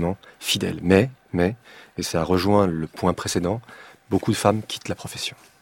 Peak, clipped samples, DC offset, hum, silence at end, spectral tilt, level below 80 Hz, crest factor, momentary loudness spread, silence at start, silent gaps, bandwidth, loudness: -2 dBFS; under 0.1%; under 0.1%; none; 0.3 s; -5 dB/octave; -48 dBFS; 22 dB; 11 LU; 0 s; none; 17 kHz; -23 LUFS